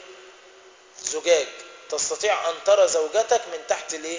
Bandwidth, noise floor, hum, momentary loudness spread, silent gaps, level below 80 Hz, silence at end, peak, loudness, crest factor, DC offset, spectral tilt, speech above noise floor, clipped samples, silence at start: 7.8 kHz; -50 dBFS; none; 12 LU; none; -68 dBFS; 0 s; -6 dBFS; -23 LUFS; 18 dB; under 0.1%; 0 dB/octave; 27 dB; under 0.1%; 0 s